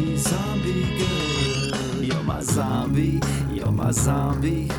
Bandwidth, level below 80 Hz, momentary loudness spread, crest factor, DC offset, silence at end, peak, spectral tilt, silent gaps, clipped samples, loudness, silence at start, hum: 18 kHz; -36 dBFS; 4 LU; 14 dB; under 0.1%; 0 s; -8 dBFS; -5 dB/octave; none; under 0.1%; -23 LUFS; 0 s; none